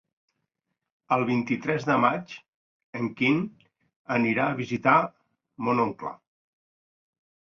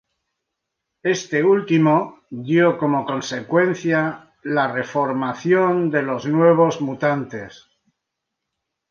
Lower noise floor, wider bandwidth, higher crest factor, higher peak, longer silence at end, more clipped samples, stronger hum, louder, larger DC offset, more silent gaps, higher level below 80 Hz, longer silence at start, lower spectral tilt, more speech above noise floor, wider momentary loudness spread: about the same, -82 dBFS vs -80 dBFS; about the same, 7 kHz vs 7.2 kHz; first, 22 dB vs 16 dB; about the same, -6 dBFS vs -4 dBFS; second, 1.25 s vs 1.4 s; neither; neither; second, -25 LUFS vs -19 LUFS; neither; first, 2.48-2.93 s, 3.96-4.05 s vs none; about the same, -68 dBFS vs -66 dBFS; about the same, 1.1 s vs 1.05 s; about the same, -7 dB/octave vs -6.5 dB/octave; second, 57 dB vs 62 dB; first, 15 LU vs 10 LU